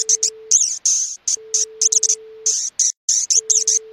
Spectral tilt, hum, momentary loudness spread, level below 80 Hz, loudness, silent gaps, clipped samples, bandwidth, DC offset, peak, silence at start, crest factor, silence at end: 5 dB/octave; none; 5 LU; -74 dBFS; -16 LUFS; 2.97-3.08 s; under 0.1%; 16.5 kHz; under 0.1%; -2 dBFS; 0 s; 18 dB; 0 s